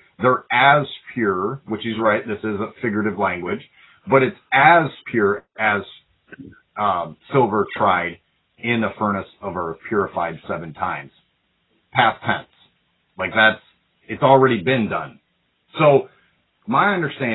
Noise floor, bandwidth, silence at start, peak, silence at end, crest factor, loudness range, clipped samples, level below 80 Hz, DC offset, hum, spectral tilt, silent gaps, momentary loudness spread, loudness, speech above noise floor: -67 dBFS; 4.1 kHz; 0.2 s; 0 dBFS; 0 s; 20 dB; 6 LU; under 0.1%; -54 dBFS; under 0.1%; none; -10.5 dB/octave; none; 14 LU; -19 LUFS; 48 dB